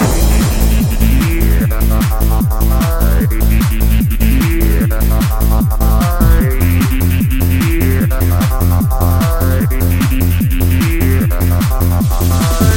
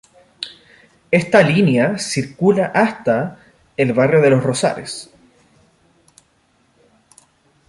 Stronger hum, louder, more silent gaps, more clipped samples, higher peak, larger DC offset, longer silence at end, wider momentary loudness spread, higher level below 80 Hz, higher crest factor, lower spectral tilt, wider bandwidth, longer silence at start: neither; first, -13 LUFS vs -16 LUFS; neither; neither; about the same, 0 dBFS vs -2 dBFS; neither; second, 0 s vs 2.65 s; second, 1 LU vs 18 LU; first, -14 dBFS vs -58 dBFS; second, 10 dB vs 18 dB; about the same, -6 dB/octave vs -5.5 dB/octave; first, 17 kHz vs 11.5 kHz; second, 0 s vs 0.4 s